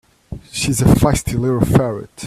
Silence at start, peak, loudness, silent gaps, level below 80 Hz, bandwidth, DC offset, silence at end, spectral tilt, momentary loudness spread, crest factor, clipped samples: 0.3 s; 0 dBFS; -16 LUFS; none; -30 dBFS; 15.5 kHz; under 0.1%; 0 s; -6 dB/octave; 16 LU; 16 dB; under 0.1%